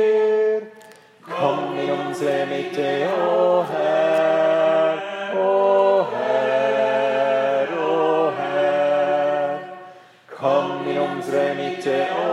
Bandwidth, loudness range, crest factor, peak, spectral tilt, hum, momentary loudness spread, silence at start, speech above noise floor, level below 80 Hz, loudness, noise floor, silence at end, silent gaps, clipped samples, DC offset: 12 kHz; 4 LU; 14 dB; -6 dBFS; -5.5 dB/octave; none; 7 LU; 0 s; 25 dB; -80 dBFS; -20 LUFS; -46 dBFS; 0 s; none; under 0.1%; under 0.1%